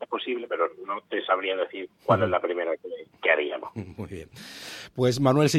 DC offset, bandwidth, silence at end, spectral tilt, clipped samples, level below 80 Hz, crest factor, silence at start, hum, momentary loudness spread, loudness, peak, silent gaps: under 0.1%; 15 kHz; 0 s; -5.5 dB/octave; under 0.1%; -60 dBFS; 20 dB; 0 s; none; 16 LU; -26 LUFS; -6 dBFS; none